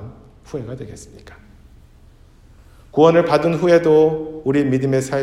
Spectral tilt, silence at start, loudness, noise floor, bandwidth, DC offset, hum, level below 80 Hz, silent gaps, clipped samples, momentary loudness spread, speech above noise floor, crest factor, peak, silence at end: -7 dB/octave; 0 s; -16 LUFS; -47 dBFS; 12.5 kHz; under 0.1%; none; -48 dBFS; none; under 0.1%; 19 LU; 30 dB; 18 dB; 0 dBFS; 0 s